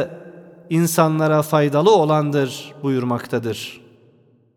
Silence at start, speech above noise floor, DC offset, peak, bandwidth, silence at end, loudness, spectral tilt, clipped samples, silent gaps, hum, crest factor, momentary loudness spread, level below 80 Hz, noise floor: 0 s; 37 dB; under 0.1%; -2 dBFS; 18 kHz; 0.8 s; -19 LUFS; -6 dB/octave; under 0.1%; none; none; 18 dB; 13 LU; -68 dBFS; -55 dBFS